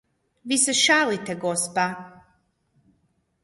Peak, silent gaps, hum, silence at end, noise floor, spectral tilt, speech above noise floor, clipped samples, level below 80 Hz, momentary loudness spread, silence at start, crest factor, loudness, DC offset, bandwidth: -6 dBFS; none; none; 1.35 s; -69 dBFS; -1.5 dB/octave; 46 dB; under 0.1%; -68 dBFS; 13 LU; 0.45 s; 20 dB; -21 LUFS; under 0.1%; 12 kHz